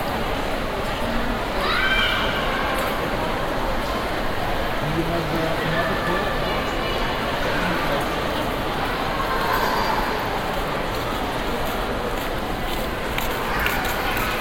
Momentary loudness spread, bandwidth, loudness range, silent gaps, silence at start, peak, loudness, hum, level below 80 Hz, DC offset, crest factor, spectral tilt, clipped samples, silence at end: 4 LU; 16.5 kHz; 2 LU; none; 0 s; -6 dBFS; -23 LUFS; none; -32 dBFS; under 0.1%; 18 dB; -4.5 dB/octave; under 0.1%; 0 s